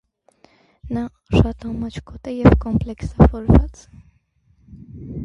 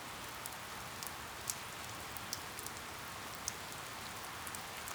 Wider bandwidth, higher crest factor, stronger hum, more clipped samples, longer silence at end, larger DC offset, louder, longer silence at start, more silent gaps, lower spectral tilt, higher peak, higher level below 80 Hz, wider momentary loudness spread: second, 8.2 kHz vs over 20 kHz; second, 20 dB vs 32 dB; neither; neither; about the same, 0 s vs 0 s; neither; first, -19 LUFS vs -44 LUFS; first, 0.85 s vs 0 s; neither; first, -9 dB/octave vs -1.5 dB/octave; first, 0 dBFS vs -14 dBFS; first, -26 dBFS vs -64 dBFS; first, 17 LU vs 3 LU